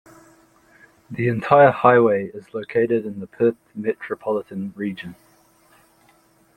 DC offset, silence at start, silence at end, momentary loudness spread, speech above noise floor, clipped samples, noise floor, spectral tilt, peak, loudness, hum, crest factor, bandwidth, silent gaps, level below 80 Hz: under 0.1%; 1.1 s; 1.45 s; 18 LU; 38 dB; under 0.1%; -57 dBFS; -8.5 dB/octave; -2 dBFS; -20 LUFS; none; 20 dB; 9.8 kHz; none; -62 dBFS